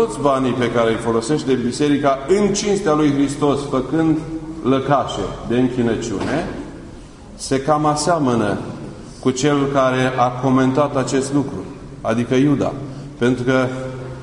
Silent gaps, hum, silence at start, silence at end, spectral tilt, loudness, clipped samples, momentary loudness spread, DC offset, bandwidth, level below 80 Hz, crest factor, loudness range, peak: none; none; 0 s; 0 s; -5.5 dB/octave; -18 LUFS; under 0.1%; 12 LU; under 0.1%; 11 kHz; -42 dBFS; 16 dB; 3 LU; -2 dBFS